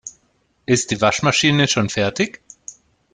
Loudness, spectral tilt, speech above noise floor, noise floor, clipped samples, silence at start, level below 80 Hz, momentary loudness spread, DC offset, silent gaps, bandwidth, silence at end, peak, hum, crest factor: -18 LUFS; -4 dB/octave; 46 dB; -63 dBFS; under 0.1%; 0.05 s; -52 dBFS; 22 LU; under 0.1%; none; 9.6 kHz; 0.4 s; -2 dBFS; none; 18 dB